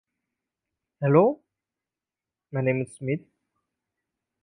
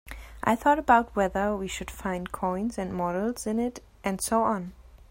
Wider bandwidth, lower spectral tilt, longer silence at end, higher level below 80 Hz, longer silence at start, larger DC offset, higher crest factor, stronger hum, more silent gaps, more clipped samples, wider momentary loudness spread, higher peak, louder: second, 10.5 kHz vs 16.5 kHz; first, -9 dB/octave vs -5 dB/octave; first, 1.25 s vs 0.15 s; second, -72 dBFS vs -48 dBFS; first, 1 s vs 0.05 s; neither; about the same, 22 dB vs 20 dB; neither; neither; neither; about the same, 13 LU vs 11 LU; about the same, -6 dBFS vs -6 dBFS; about the same, -25 LUFS vs -27 LUFS